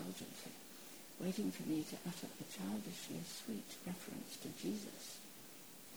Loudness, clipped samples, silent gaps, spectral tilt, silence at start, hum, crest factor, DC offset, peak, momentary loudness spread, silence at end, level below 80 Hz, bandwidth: -47 LUFS; under 0.1%; none; -4.5 dB/octave; 0 s; none; 18 dB; under 0.1%; -30 dBFS; 11 LU; 0 s; -78 dBFS; over 20 kHz